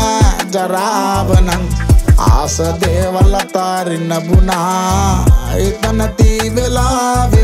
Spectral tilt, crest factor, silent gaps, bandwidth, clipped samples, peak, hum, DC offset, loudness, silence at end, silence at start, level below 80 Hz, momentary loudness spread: -5.5 dB/octave; 12 dB; none; 16 kHz; under 0.1%; 0 dBFS; none; under 0.1%; -13 LUFS; 0 s; 0 s; -16 dBFS; 5 LU